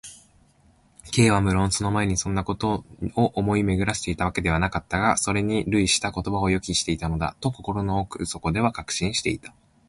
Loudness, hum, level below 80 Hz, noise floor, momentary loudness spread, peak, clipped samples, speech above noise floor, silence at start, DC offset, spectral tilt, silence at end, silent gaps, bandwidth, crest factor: -24 LUFS; none; -40 dBFS; -59 dBFS; 7 LU; -4 dBFS; under 0.1%; 35 dB; 0.05 s; under 0.1%; -4.5 dB/octave; 0.4 s; none; 11.5 kHz; 20 dB